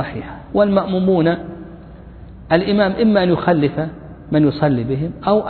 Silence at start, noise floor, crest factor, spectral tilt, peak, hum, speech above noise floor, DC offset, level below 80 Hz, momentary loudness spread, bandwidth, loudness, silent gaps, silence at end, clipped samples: 0 s; -37 dBFS; 16 dB; -11 dB/octave; 0 dBFS; none; 21 dB; under 0.1%; -42 dBFS; 14 LU; 4.5 kHz; -17 LUFS; none; 0 s; under 0.1%